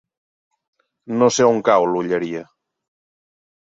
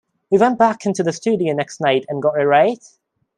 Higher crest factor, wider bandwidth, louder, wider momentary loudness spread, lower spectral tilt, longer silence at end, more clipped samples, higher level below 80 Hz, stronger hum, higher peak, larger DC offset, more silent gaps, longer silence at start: about the same, 18 dB vs 16 dB; second, 7.8 kHz vs 10.5 kHz; about the same, -18 LUFS vs -17 LUFS; first, 13 LU vs 6 LU; about the same, -4.5 dB/octave vs -5.5 dB/octave; first, 1.2 s vs 0.6 s; neither; about the same, -62 dBFS vs -64 dBFS; neither; about the same, -2 dBFS vs -2 dBFS; neither; neither; first, 1.1 s vs 0.3 s